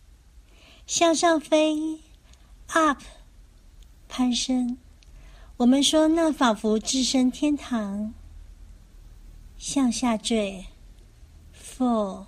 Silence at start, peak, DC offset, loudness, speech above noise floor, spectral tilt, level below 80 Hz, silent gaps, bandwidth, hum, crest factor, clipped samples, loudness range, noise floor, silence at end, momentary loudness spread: 0.35 s; -6 dBFS; under 0.1%; -23 LUFS; 29 dB; -3 dB/octave; -48 dBFS; none; 13.5 kHz; none; 20 dB; under 0.1%; 6 LU; -52 dBFS; 0 s; 15 LU